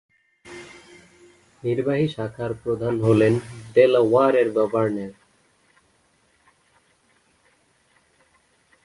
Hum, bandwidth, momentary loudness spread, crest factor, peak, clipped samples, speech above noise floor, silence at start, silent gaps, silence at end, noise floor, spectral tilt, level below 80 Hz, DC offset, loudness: none; 11.5 kHz; 23 LU; 20 dB; -4 dBFS; under 0.1%; 43 dB; 0.45 s; none; 3.75 s; -63 dBFS; -7.5 dB/octave; -58 dBFS; under 0.1%; -21 LUFS